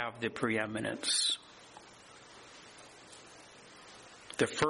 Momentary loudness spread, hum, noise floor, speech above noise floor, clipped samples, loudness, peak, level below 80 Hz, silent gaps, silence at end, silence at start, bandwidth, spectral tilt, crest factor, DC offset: 24 LU; none; -55 dBFS; 22 dB; under 0.1%; -33 LUFS; -14 dBFS; -70 dBFS; none; 0 s; 0 s; 11.5 kHz; -2.5 dB/octave; 24 dB; under 0.1%